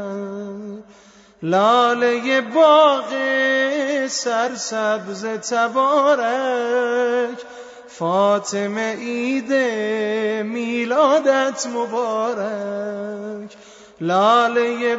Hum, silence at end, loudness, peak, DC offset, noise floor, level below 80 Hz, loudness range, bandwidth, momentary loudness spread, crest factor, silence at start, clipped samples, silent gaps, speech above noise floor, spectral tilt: none; 0 s; -19 LUFS; -2 dBFS; under 0.1%; -48 dBFS; -72 dBFS; 4 LU; 8 kHz; 15 LU; 18 dB; 0 s; under 0.1%; none; 30 dB; -3.5 dB/octave